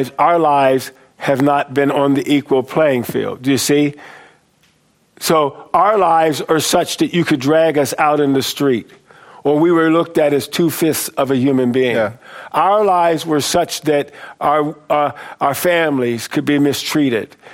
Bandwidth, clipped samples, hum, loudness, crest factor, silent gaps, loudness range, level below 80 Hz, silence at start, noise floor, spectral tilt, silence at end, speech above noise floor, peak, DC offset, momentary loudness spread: 16.5 kHz; under 0.1%; none; -15 LUFS; 14 dB; none; 3 LU; -58 dBFS; 0 s; -57 dBFS; -4.5 dB/octave; 0 s; 42 dB; 0 dBFS; under 0.1%; 7 LU